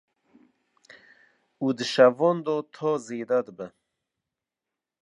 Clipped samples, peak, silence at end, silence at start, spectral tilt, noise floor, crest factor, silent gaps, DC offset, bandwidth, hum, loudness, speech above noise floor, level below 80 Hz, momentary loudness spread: under 0.1%; -4 dBFS; 1.35 s; 1.6 s; -5.5 dB/octave; -88 dBFS; 22 dB; none; under 0.1%; 10.5 kHz; none; -24 LUFS; 64 dB; -82 dBFS; 17 LU